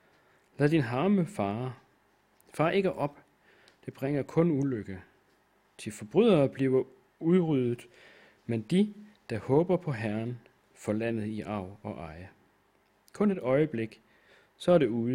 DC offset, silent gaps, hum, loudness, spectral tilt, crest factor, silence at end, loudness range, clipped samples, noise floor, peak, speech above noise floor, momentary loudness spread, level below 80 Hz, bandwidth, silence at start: under 0.1%; none; none; -29 LUFS; -7.5 dB/octave; 18 dB; 0 s; 5 LU; under 0.1%; -68 dBFS; -12 dBFS; 40 dB; 17 LU; -64 dBFS; 15.5 kHz; 0.6 s